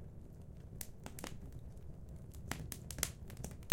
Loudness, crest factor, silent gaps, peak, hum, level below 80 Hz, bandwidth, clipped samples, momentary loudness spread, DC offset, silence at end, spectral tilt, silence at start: -47 LUFS; 38 dB; none; -8 dBFS; none; -54 dBFS; 17 kHz; under 0.1%; 13 LU; under 0.1%; 0 s; -3.5 dB/octave; 0 s